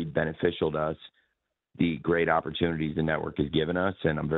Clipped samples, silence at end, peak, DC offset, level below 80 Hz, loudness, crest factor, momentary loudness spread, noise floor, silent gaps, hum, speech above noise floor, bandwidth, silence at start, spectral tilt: under 0.1%; 0 s; -10 dBFS; under 0.1%; -50 dBFS; -28 LUFS; 18 dB; 4 LU; -80 dBFS; none; none; 52 dB; 4.1 kHz; 0 s; -9.5 dB/octave